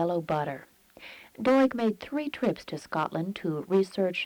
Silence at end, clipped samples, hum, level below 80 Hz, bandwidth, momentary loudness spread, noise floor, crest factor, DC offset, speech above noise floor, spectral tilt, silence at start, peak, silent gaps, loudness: 0 s; under 0.1%; none; -66 dBFS; 20 kHz; 20 LU; -50 dBFS; 16 dB; under 0.1%; 22 dB; -6.5 dB/octave; 0 s; -12 dBFS; none; -29 LUFS